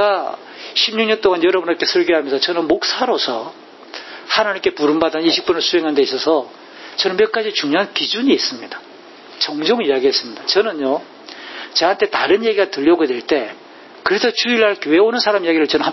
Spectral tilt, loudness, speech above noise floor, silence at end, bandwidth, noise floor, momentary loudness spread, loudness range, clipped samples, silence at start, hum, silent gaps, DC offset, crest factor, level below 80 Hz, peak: -3 dB/octave; -16 LUFS; 22 dB; 0 s; 6.2 kHz; -39 dBFS; 15 LU; 2 LU; under 0.1%; 0 s; none; none; under 0.1%; 18 dB; -60 dBFS; 0 dBFS